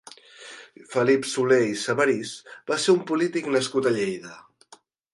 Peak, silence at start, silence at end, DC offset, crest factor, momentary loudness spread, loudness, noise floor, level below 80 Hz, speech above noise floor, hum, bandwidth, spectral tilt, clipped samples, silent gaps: -8 dBFS; 0.4 s; 0.75 s; under 0.1%; 18 dB; 21 LU; -23 LUFS; -55 dBFS; -72 dBFS; 32 dB; none; 11.5 kHz; -4.5 dB/octave; under 0.1%; none